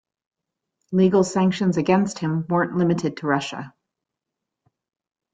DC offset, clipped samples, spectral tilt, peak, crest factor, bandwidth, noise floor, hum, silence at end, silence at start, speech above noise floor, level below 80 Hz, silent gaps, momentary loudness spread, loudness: under 0.1%; under 0.1%; -6.5 dB/octave; -4 dBFS; 18 dB; 9.2 kHz; -84 dBFS; none; 1.65 s; 0.9 s; 64 dB; -62 dBFS; none; 8 LU; -21 LUFS